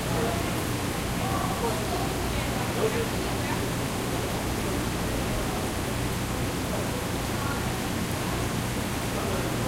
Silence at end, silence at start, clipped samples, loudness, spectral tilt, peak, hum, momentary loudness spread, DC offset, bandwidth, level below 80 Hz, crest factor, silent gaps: 0 s; 0 s; under 0.1%; -28 LUFS; -4.5 dB/octave; -14 dBFS; none; 2 LU; under 0.1%; 16 kHz; -38 dBFS; 14 dB; none